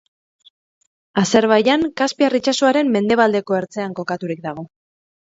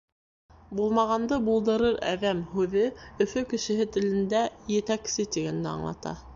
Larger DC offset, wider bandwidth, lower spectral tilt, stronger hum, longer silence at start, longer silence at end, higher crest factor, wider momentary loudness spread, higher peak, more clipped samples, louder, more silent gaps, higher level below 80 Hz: neither; about the same, 8 kHz vs 7.6 kHz; about the same, -4.5 dB/octave vs -5 dB/octave; neither; first, 1.15 s vs 0.7 s; first, 0.55 s vs 0 s; about the same, 18 dB vs 16 dB; first, 12 LU vs 6 LU; first, 0 dBFS vs -12 dBFS; neither; first, -18 LUFS vs -27 LUFS; neither; about the same, -58 dBFS vs -54 dBFS